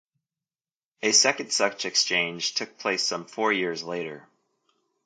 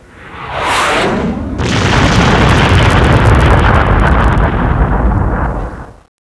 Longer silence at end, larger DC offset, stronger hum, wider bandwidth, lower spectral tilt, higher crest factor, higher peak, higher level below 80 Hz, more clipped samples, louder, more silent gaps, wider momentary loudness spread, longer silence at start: first, 0.85 s vs 0.4 s; neither; neither; about the same, 11 kHz vs 11 kHz; second, -1 dB/octave vs -6 dB/octave; first, 22 dB vs 10 dB; second, -6 dBFS vs 0 dBFS; second, -80 dBFS vs -16 dBFS; second, under 0.1% vs 0.2%; second, -24 LUFS vs -10 LUFS; neither; about the same, 12 LU vs 10 LU; first, 1 s vs 0.2 s